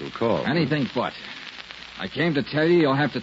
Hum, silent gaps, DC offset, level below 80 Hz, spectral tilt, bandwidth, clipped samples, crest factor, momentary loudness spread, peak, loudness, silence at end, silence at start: none; none; under 0.1%; -58 dBFS; -7 dB/octave; 7.8 kHz; under 0.1%; 14 dB; 17 LU; -10 dBFS; -23 LUFS; 0 s; 0 s